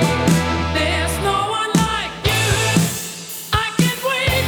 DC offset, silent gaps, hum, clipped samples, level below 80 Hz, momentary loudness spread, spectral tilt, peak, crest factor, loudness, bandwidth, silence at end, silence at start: under 0.1%; none; none; under 0.1%; -32 dBFS; 5 LU; -4 dB/octave; -2 dBFS; 16 dB; -18 LUFS; over 20 kHz; 0 s; 0 s